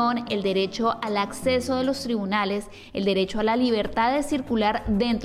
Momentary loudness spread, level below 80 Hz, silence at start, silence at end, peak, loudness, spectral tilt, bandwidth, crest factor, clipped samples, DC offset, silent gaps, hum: 4 LU; -46 dBFS; 0 s; 0 s; -12 dBFS; -24 LUFS; -5 dB/octave; 15 kHz; 12 dB; under 0.1%; under 0.1%; none; none